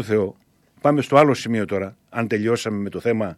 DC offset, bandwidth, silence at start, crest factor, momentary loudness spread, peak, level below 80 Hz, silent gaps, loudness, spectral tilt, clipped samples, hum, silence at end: under 0.1%; 13 kHz; 0 s; 18 dB; 12 LU; -4 dBFS; -62 dBFS; none; -21 LUFS; -6.5 dB/octave; under 0.1%; none; 0.05 s